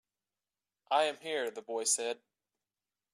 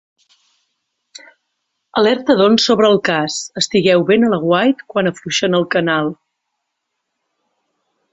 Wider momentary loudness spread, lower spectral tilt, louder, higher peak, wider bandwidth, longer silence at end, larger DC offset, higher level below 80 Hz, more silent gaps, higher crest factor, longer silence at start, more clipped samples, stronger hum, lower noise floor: about the same, 8 LU vs 7 LU; second, 0 dB/octave vs -4.5 dB/octave; second, -33 LUFS vs -15 LUFS; second, -16 dBFS vs -2 dBFS; first, 14.5 kHz vs 8.4 kHz; second, 0.95 s vs 2 s; neither; second, under -90 dBFS vs -60 dBFS; neither; first, 22 dB vs 16 dB; second, 0.9 s vs 1.95 s; neither; neither; first, under -90 dBFS vs -75 dBFS